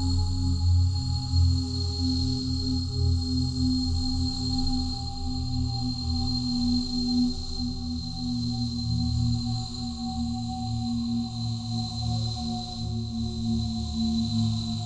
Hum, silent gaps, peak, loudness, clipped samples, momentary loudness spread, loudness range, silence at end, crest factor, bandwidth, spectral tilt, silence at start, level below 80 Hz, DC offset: none; none; -14 dBFS; -28 LUFS; under 0.1%; 6 LU; 4 LU; 0 s; 14 dB; 9.6 kHz; -6.5 dB/octave; 0 s; -34 dBFS; under 0.1%